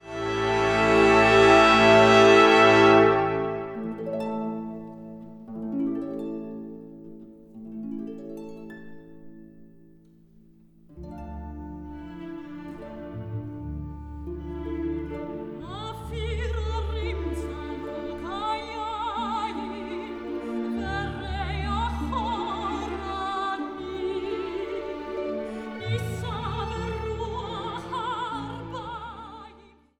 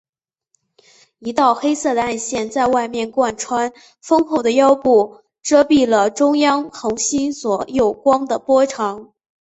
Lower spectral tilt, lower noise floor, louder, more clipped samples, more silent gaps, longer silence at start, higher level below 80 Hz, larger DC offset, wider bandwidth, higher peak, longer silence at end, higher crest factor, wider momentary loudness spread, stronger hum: first, -5.5 dB/octave vs -3.5 dB/octave; second, -54 dBFS vs -68 dBFS; second, -24 LUFS vs -17 LUFS; neither; neither; second, 0.05 s vs 1.2 s; first, -40 dBFS vs -54 dBFS; neither; first, 12 kHz vs 8.2 kHz; second, -6 dBFS vs -2 dBFS; about the same, 0.4 s vs 0.5 s; about the same, 20 dB vs 16 dB; first, 23 LU vs 10 LU; neither